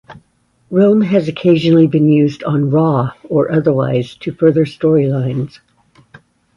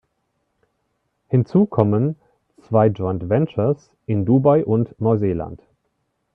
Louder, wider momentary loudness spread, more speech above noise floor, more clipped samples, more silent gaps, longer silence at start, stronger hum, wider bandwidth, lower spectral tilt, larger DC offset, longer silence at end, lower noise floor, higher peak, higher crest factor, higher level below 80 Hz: first, -14 LUFS vs -19 LUFS; about the same, 8 LU vs 9 LU; second, 45 dB vs 53 dB; neither; neither; second, 0.1 s vs 1.3 s; neither; first, 7.2 kHz vs 6 kHz; second, -9 dB/octave vs -11.5 dB/octave; neither; first, 1.1 s vs 0.8 s; second, -57 dBFS vs -71 dBFS; about the same, 0 dBFS vs 0 dBFS; second, 14 dB vs 20 dB; about the same, -52 dBFS vs -54 dBFS